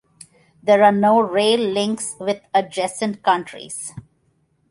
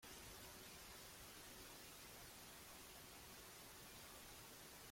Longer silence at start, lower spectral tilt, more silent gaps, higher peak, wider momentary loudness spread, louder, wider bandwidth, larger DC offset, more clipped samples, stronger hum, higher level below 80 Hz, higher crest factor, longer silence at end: first, 0.65 s vs 0 s; first, -4 dB/octave vs -2 dB/octave; neither; first, -2 dBFS vs -46 dBFS; first, 16 LU vs 1 LU; first, -18 LUFS vs -57 LUFS; second, 11.5 kHz vs 16.5 kHz; neither; neither; neither; first, -64 dBFS vs -72 dBFS; about the same, 18 dB vs 14 dB; first, 0.7 s vs 0 s